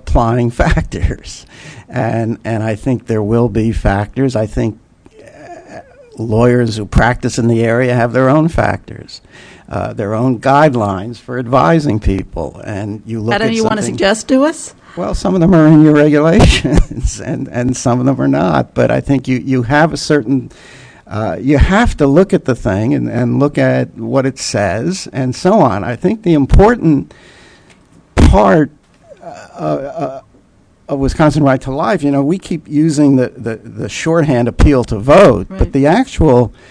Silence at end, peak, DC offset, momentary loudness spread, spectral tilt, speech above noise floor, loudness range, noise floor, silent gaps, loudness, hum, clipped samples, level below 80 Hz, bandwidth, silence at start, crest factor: 0.2 s; 0 dBFS; under 0.1%; 14 LU; -6.5 dB/octave; 36 dB; 6 LU; -48 dBFS; none; -13 LUFS; none; 0.5%; -24 dBFS; 11 kHz; 0.05 s; 12 dB